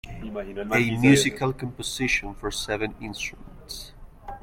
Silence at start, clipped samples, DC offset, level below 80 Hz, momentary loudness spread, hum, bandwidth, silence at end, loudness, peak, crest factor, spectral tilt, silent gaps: 0.05 s; under 0.1%; under 0.1%; -44 dBFS; 20 LU; none; 16.5 kHz; 0.05 s; -25 LUFS; -6 dBFS; 20 dB; -4.5 dB/octave; none